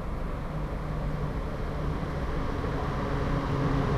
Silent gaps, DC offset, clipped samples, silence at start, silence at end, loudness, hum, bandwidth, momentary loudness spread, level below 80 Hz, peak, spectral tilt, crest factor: none; under 0.1%; under 0.1%; 0 s; 0 s; -32 LUFS; none; 13 kHz; 6 LU; -34 dBFS; -16 dBFS; -8 dB/octave; 14 dB